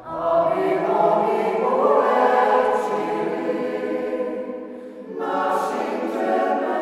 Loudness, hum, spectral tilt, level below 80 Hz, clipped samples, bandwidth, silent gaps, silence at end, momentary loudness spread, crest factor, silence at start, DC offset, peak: -21 LUFS; none; -6 dB/octave; -64 dBFS; under 0.1%; 13.5 kHz; none; 0 s; 11 LU; 16 dB; 0 s; under 0.1%; -6 dBFS